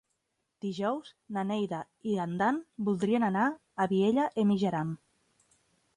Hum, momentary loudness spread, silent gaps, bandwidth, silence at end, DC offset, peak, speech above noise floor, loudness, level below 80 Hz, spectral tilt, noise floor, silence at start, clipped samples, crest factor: none; 11 LU; none; 10.5 kHz; 1 s; under 0.1%; -16 dBFS; 51 dB; -31 LUFS; -72 dBFS; -7 dB/octave; -81 dBFS; 0.65 s; under 0.1%; 16 dB